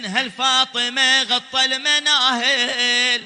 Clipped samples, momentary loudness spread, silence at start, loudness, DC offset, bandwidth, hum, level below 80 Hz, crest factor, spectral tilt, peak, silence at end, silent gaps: under 0.1%; 4 LU; 0 s; -16 LUFS; under 0.1%; 10 kHz; none; -72 dBFS; 16 dB; 0 dB/octave; -2 dBFS; 0 s; none